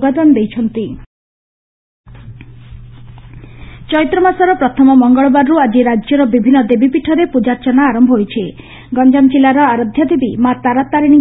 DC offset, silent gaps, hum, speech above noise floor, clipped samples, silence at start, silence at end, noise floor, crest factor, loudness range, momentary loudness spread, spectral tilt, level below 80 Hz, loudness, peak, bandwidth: under 0.1%; 1.06-2.04 s; none; 23 dB; under 0.1%; 0 s; 0 s; -33 dBFS; 12 dB; 11 LU; 9 LU; -10.5 dB/octave; -42 dBFS; -11 LUFS; 0 dBFS; 4 kHz